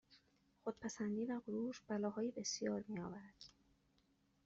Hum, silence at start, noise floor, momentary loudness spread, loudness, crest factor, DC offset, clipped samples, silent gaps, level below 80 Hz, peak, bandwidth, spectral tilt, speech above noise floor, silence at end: none; 0.1 s; -78 dBFS; 13 LU; -44 LUFS; 16 dB; under 0.1%; under 0.1%; none; -80 dBFS; -30 dBFS; 8 kHz; -5 dB/octave; 34 dB; 0.95 s